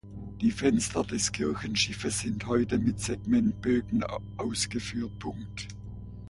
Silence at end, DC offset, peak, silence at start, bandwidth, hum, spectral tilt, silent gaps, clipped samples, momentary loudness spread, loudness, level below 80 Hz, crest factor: 0 s; under 0.1%; -12 dBFS; 0.05 s; 11.5 kHz; 60 Hz at -45 dBFS; -4.5 dB/octave; none; under 0.1%; 13 LU; -29 LUFS; -48 dBFS; 18 dB